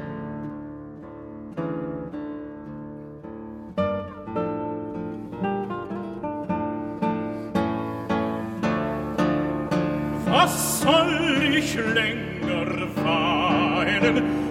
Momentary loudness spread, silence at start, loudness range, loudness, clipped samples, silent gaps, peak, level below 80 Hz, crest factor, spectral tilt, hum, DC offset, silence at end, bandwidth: 17 LU; 0 s; 11 LU; -25 LUFS; under 0.1%; none; -6 dBFS; -50 dBFS; 20 dB; -4.5 dB/octave; none; under 0.1%; 0 s; 16.5 kHz